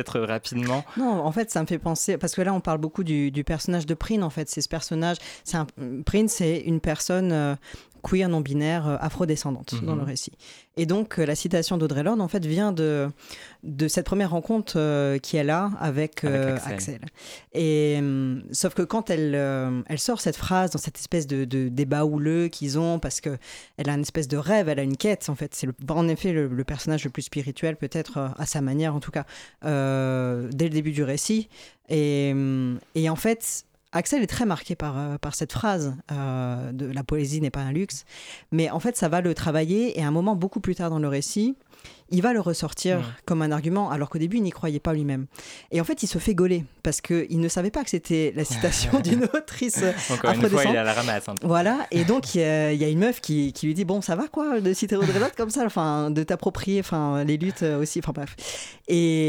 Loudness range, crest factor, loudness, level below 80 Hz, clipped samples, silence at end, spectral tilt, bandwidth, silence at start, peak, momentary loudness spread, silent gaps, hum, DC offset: 4 LU; 20 dB; -25 LUFS; -46 dBFS; under 0.1%; 0 s; -5.5 dB/octave; 17.5 kHz; 0 s; -6 dBFS; 8 LU; none; none; under 0.1%